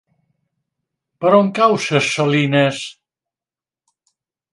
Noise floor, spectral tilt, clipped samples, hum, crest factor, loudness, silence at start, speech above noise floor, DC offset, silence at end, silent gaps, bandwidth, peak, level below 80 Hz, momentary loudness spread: under -90 dBFS; -5 dB/octave; under 0.1%; none; 20 dB; -15 LUFS; 1.2 s; over 75 dB; under 0.1%; 1.6 s; none; 11.5 kHz; 0 dBFS; -66 dBFS; 8 LU